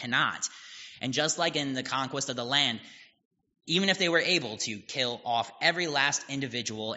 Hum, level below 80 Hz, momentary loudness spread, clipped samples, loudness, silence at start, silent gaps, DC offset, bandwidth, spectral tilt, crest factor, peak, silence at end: none; -74 dBFS; 9 LU; under 0.1%; -28 LUFS; 0 s; 3.25-3.31 s; under 0.1%; 8 kHz; -1.5 dB/octave; 22 dB; -8 dBFS; 0 s